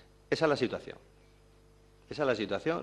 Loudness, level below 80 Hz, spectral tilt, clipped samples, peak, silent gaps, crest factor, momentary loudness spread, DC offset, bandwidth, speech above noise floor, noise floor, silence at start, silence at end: -32 LUFS; -62 dBFS; -5.5 dB/octave; under 0.1%; -12 dBFS; none; 22 dB; 17 LU; under 0.1%; 11.5 kHz; 29 dB; -60 dBFS; 0.3 s; 0 s